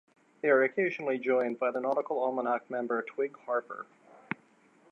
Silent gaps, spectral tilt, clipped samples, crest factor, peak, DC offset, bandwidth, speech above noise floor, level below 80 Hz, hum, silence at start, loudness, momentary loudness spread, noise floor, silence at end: none; -7.5 dB/octave; under 0.1%; 20 dB; -12 dBFS; under 0.1%; 6.6 kHz; 33 dB; -88 dBFS; none; 0.45 s; -31 LUFS; 15 LU; -63 dBFS; 1.1 s